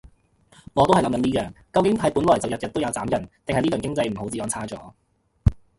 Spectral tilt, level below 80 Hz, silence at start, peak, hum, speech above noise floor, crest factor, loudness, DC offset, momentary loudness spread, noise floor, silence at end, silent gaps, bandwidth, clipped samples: -5.5 dB/octave; -38 dBFS; 0.05 s; -4 dBFS; none; 34 dB; 20 dB; -23 LUFS; under 0.1%; 9 LU; -57 dBFS; 0.2 s; none; 12 kHz; under 0.1%